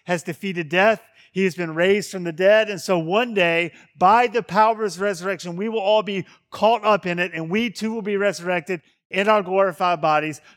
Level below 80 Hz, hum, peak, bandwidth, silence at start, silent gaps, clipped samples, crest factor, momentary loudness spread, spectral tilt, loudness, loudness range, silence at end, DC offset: -66 dBFS; none; -2 dBFS; 16.5 kHz; 0.05 s; 9.05-9.10 s; under 0.1%; 18 dB; 10 LU; -5 dB/octave; -21 LUFS; 3 LU; 0.2 s; under 0.1%